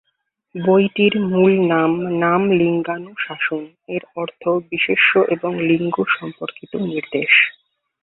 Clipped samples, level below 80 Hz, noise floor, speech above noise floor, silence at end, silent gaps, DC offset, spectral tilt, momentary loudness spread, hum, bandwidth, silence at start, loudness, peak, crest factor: under 0.1%; -60 dBFS; -72 dBFS; 54 dB; 0.5 s; none; under 0.1%; -11 dB/octave; 14 LU; none; 4.1 kHz; 0.55 s; -17 LUFS; -2 dBFS; 18 dB